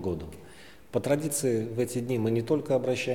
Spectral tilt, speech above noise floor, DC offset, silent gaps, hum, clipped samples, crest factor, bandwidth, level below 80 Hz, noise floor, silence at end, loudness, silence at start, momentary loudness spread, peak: -5.5 dB/octave; 23 dB; 0.2%; none; none; under 0.1%; 18 dB; 18 kHz; -56 dBFS; -51 dBFS; 0 s; -29 LUFS; 0 s; 9 LU; -12 dBFS